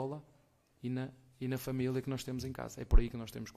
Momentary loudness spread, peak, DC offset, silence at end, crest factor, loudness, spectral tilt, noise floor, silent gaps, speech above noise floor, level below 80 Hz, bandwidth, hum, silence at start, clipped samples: 11 LU; -12 dBFS; under 0.1%; 0.05 s; 22 dB; -38 LUFS; -6.5 dB/octave; -69 dBFS; none; 36 dB; -36 dBFS; 15 kHz; none; 0 s; under 0.1%